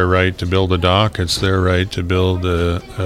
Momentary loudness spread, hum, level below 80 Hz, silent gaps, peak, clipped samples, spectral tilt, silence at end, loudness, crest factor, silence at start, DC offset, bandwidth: 4 LU; none; -38 dBFS; none; 0 dBFS; under 0.1%; -5.5 dB/octave; 0 s; -16 LUFS; 16 dB; 0 s; under 0.1%; 13 kHz